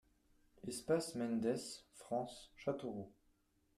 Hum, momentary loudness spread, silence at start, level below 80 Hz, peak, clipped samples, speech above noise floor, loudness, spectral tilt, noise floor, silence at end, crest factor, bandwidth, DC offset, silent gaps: none; 13 LU; 0.65 s; -74 dBFS; -24 dBFS; under 0.1%; 35 dB; -42 LUFS; -5 dB/octave; -77 dBFS; 0.65 s; 20 dB; 14.5 kHz; under 0.1%; none